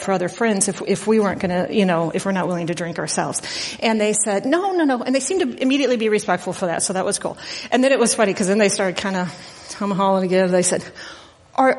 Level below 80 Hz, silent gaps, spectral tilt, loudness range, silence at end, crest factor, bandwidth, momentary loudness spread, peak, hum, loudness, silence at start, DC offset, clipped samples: -58 dBFS; none; -4 dB/octave; 2 LU; 0 s; 18 dB; 11.5 kHz; 9 LU; -2 dBFS; none; -20 LUFS; 0 s; under 0.1%; under 0.1%